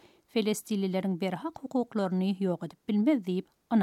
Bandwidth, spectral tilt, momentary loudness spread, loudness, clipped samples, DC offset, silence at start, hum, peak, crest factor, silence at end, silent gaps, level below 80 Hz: 14.5 kHz; -6.5 dB/octave; 7 LU; -31 LUFS; under 0.1%; under 0.1%; 0.35 s; none; -14 dBFS; 16 dB; 0 s; none; -76 dBFS